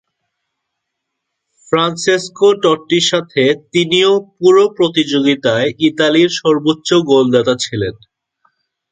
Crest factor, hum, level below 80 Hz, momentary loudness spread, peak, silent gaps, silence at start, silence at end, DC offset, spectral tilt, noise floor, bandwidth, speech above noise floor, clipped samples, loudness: 14 dB; none; -54 dBFS; 5 LU; 0 dBFS; none; 1.7 s; 1 s; under 0.1%; -4.5 dB/octave; -76 dBFS; 9.4 kHz; 63 dB; under 0.1%; -13 LUFS